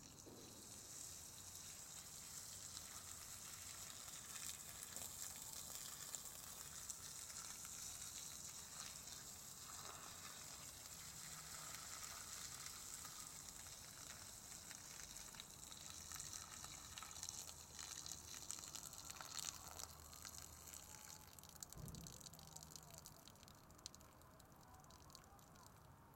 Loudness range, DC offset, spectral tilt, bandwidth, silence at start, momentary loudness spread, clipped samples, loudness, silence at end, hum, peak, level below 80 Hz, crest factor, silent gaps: 6 LU; under 0.1%; -1 dB/octave; 16.5 kHz; 0 s; 9 LU; under 0.1%; -52 LUFS; 0 s; none; -26 dBFS; -74 dBFS; 30 dB; none